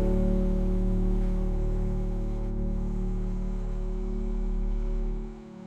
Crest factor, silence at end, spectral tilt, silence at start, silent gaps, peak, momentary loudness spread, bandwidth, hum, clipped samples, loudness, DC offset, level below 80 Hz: 12 dB; 0 s; -9.5 dB/octave; 0 s; none; -14 dBFS; 7 LU; 3.3 kHz; none; under 0.1%; -31 LUFS; under 0.1%; -28 dBFS